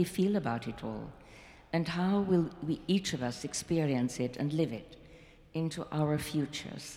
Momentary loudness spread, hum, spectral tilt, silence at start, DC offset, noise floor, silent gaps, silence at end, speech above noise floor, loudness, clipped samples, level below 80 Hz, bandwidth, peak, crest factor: 13 LU; none; -6 dB/octave; 0 s; under 0.1%; -56 dBFS; none; 0 s; 23 dB; -33 LUFS; under 0.1%; -60 dBFS; 16.5 kHz; -16 dBFS; 16 dB